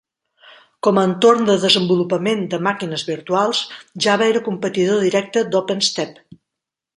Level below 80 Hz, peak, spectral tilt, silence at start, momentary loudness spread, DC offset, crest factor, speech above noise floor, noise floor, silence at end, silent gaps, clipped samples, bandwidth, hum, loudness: -64 dBFS; 0 dBFS; -4.5 dB/octave; 0.85 s; 9 LU; under 0.1%; 18 dB; 66 dB; -84 dBFS; 0.85 s; none; under 0.1%; 11 kHz; none; -17 LUFS